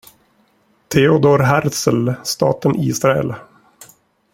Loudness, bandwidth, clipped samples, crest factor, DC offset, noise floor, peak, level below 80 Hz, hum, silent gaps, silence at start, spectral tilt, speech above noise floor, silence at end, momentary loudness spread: -16 LUFS; 16.5 kHz; under 0.1%; 18 dB; under 0.1%; -58 dBFS; 0 dBFS; -52 dBFS; none; none; 0.9 s; -5.5 dB/octave; 43 dB; 0.95 s; 8 LU